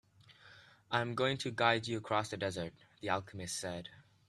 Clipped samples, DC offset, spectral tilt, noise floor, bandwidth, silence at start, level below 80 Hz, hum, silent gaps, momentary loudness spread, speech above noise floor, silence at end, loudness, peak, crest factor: under 0.1%; under 0.1%; -4 dB/octave; -61 dBFS; 14 kHz; 0.3 s; -72 dBFS; none; none; 13 LU; 25 dB; 0.25 s; -36 LUFS; -12 dBFS; 26 dB